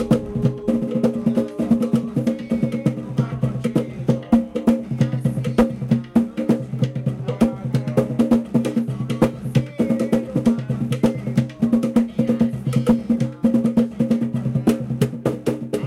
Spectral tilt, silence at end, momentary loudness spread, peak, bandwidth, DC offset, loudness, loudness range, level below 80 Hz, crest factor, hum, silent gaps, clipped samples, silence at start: -8.5 dB/octave; 0 s; 5 LU; -2 dBFS; 13 kHz; under 0.1%; -21 LUFS; 2 LU; -44 dBFS; 18 dB; none; none; under 0.1%; 0 s